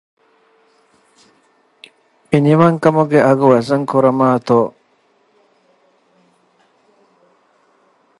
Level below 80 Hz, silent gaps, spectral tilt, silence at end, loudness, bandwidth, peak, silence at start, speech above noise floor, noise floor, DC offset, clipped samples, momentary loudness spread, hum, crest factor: -62 dBFS; none; -8 dB/octave; 3.5 s; -13 LUFS; 11.5 kHz; 0 dBFS; 2.3 s; 45 dB; -58 dBFS; under 0.1%; under 0.1%; 5 LU; none; 18 dB